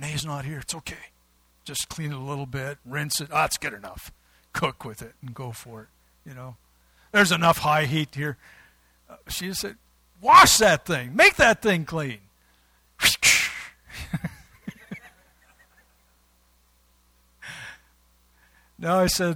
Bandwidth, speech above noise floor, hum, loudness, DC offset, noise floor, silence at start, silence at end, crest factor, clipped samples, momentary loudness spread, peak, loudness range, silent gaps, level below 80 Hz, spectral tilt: 18.5 kHz; 40 dB; none; -21 LUFS; under 0.1%; -63 dBFS; 0 s; 0 s; 26 dB; under 0.1%; 26 LU; 0 dBFS; 16 LU; none; -50 dBFS; -3 dB/octave